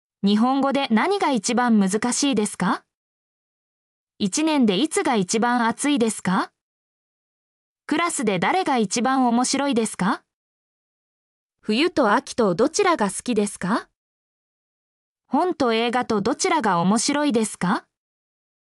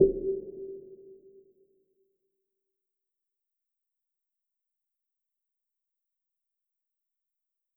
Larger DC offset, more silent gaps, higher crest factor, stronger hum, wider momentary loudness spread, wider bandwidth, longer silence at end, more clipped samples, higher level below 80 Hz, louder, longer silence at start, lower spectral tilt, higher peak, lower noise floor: neither; first, 2.95-4.07 s, 6.61-7.76 s, 10.33-11.50 s, 13.95-15.16 s vs none; second, 14 dB vs 28 dB; neither; second, 6 LU vs 24 LU; first, 12 kHz vs 0.9 kHz; second, 0.9 s vs 6.65 s; neither; second, -64 dBFS vs -58 dBFS; first, -21 LUFS vs -32 LUFS; first, 0.25 s vs 0 s; second, -4 dB/octave vs -14 dB/octave; about the same, -8 dBFS vs -8 dBFS; about the same, under -90 dBFS vs -87 dBFS